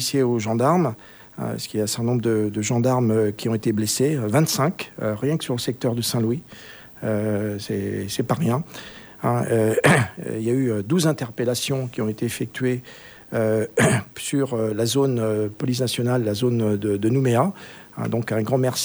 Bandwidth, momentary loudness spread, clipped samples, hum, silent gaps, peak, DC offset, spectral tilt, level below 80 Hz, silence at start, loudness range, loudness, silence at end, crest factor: over 20 kHz; 10 LU; under 0.1%; none; none; -4 dBFS; under 0.1%; -5.5 dB/octave; -58 dBFS; 0 s; 4 LU; -22 LUFS; 0 s; 18 dB